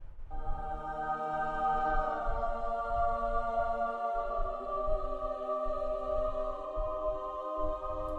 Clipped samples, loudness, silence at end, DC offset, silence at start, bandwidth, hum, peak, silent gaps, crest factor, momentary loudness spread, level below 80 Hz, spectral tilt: under 0.1%; -35 LUFS; 0 s; under 0.1%; 0 s; 4.5 kHz; none; -18 dBFS; none; 14 dB; 6 LU; -40 dBFS; -7 dB/octave